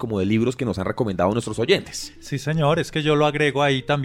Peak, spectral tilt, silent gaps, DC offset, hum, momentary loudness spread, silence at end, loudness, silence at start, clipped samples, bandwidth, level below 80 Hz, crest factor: -4 dBFS; -5.5 dB/octave; none; under 0.1%; none; 8 LU; 0 s; -21 LUFS; 0 s; under 0.1%; 15.5 kHz; -48 dBFS; 18 dB